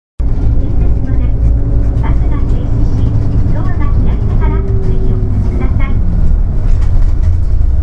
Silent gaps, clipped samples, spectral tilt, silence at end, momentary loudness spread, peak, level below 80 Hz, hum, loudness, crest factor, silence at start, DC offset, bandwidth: none; under 0.1%; -10 dB/octave; 0 s; 2 LU; 0 dBFS; -10 dBFS; none; -14 LUFS; 8 dB; 0.2 s; under 0.1%; 3.4 kHz